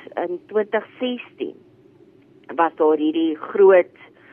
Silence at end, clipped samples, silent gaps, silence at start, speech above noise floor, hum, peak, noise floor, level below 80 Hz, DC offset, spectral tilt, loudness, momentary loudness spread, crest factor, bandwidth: 0.5 s; under 0.1%; none; 0.15 s; 32 dB; none; -4 dBFS; -51 dBFS; -76 dBFS; under 0.1%; -8 dB/octave; -20 LUFS; 18 LU; 18 dB; 3.5 kHz